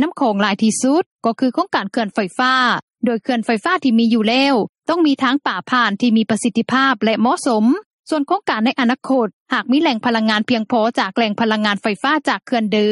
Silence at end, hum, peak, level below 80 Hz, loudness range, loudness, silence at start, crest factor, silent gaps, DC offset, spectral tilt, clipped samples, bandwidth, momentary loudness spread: 0 s; none; -2 dBFS; -66 dBFS; 1 LU; -17 LUFS; 0 s; 16 dB; 1.06-1.17 s, 2.83-2.88 s, 4.69-4.73 s, 7.86-8.03 s, 9.33-9.46 s; under 0.1%; -4.5 dB/octave; under 0.1%; 11.5 kHz; 5 LU